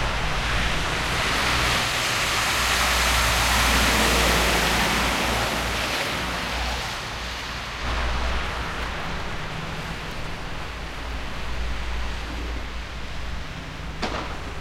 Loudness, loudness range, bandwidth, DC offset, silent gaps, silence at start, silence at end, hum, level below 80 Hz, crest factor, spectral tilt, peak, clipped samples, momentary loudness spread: -24 LUFS; 12 LU; 16.5 kHz; under 0.1%; none; 0 s; 0 s; none; -32 dBFS; 18 dB; -2.5 dB/octave; -8 dBFS; under 0.1%; 14 LU